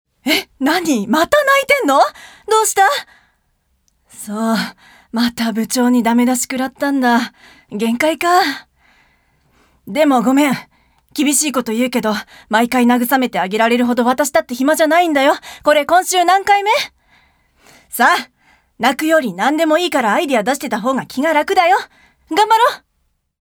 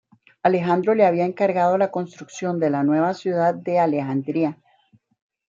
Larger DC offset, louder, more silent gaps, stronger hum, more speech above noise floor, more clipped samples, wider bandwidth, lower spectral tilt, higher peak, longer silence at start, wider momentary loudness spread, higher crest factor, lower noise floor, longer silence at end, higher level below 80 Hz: neither; first, -15 LUFS vs -21 LUFS; neither; neither; first, 51 dB vs 39 dB; neither; first, over 20 kHz vs 7.6 kHz; second, -3 dB/octave vs -7.5 dB/octave; first, 0 dBFS vs -4 dBFS; second, 0.25 s vs 0.45 s; about the same, 9 LU vs 8 LU; about the same, 16 dB vs 18 dB; first, -65 dBFS vs -60 dBFS; second, 0.65 s vs 1 s; first, -56 dBFS vs -72 dBFS